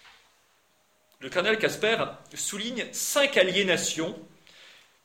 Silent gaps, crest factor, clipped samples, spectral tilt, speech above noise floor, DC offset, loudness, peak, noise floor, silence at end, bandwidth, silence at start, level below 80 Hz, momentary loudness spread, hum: none; 22 dB; under 0.1%; -2 dB/octave; 40 dB; under 0.1%; -26 LUFS; -8 dBFS; -67 dBFS; 0.35 s; 16.5 kHz; 0.05 s; -68 dBFS; 11 LU; none